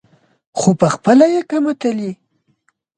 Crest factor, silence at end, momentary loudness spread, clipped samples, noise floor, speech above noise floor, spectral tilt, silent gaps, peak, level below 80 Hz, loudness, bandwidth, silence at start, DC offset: 16 dB; 0.85 s; 14 LU; under 0.1%; -63 dBFS; 49 dB; -6 dB/octave; none; 0 dBFS; -56 dBFS; -15 LUFS; 9.6 kHz; 0.55 s; under 0.1%